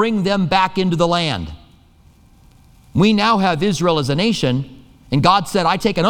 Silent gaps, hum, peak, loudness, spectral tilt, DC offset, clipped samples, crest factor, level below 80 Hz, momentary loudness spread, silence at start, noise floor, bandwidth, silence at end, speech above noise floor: none; none; 0 dBFS; -17 LUFS; -5.5 dB/octave; under 0.1%; under 0.1%; 18 dB; -42 dBFS; 9 LU; 0 s; -49 dBFS; 16 kHz; 0 s; 33 dB